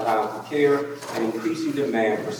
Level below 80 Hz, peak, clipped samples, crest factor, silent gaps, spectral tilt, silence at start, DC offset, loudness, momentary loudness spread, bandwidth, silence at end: -76 dBFS; -8 dBFS; under 0.1%; 16 dB; none; -5.5 dB/octave; 0 s; under 0.1%; -24 LUFS; 6 LU; 20 kHz; 0 s